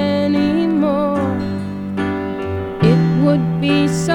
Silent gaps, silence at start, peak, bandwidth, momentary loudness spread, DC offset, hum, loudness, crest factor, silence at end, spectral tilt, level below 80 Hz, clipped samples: none; 0 s; -2 dBFS; 11.5 kHz; 9 LU; under 0.1%; none; -17 LUFS; 14 dB; 0 s; -7 dB/octave; -44 dBFS; under 0.1%